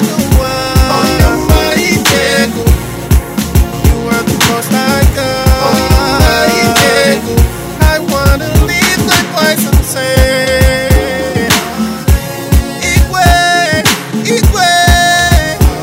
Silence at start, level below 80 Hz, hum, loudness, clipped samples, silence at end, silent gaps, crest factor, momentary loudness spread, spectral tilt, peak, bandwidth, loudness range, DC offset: 0 s; -14 dBFS; none; -10 LUFS; 0.9%; 0 s; none; 10 dB; 5 LU; -4.5 dB/octave; 0 dBFS; 16.5 kHz; 2 LU; under 0.1%